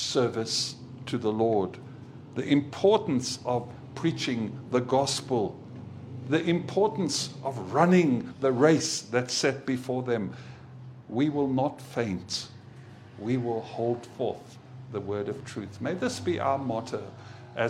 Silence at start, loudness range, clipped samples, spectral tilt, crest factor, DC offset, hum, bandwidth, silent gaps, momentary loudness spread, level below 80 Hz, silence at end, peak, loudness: 0 s; 7 LU; under 0.1%; -5 dB/octave; 22 dB; under 0.1%; none; 15 kHz; none; 19 LU; -66 dBFS; 0 s; -6 dBFS; -28 LUFS